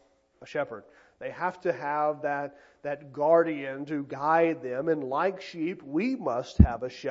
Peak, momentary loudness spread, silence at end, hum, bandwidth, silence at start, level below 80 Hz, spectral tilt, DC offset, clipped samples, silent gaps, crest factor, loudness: -2 dBFS; 14 LU; 0 s; none; 7.6 kHz; 0.4 s; -38 dBFS; -8 dB/octave; under 0.1%; under 0.1%; none; 26 dB; -28 LUFS